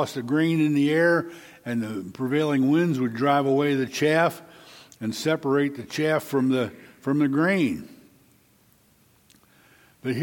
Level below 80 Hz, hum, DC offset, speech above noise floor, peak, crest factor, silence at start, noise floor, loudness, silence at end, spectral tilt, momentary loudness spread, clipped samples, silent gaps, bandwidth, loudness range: -68 dBFS; none; under 0.1%; 37 dB; -8 dBFS; 18 dB; 0 s; -60 dBFS; -24 LUFS; 0 s; -6 dB/octave; 12 LU; under 0.1%; none; 17.5 kHz; 4 LU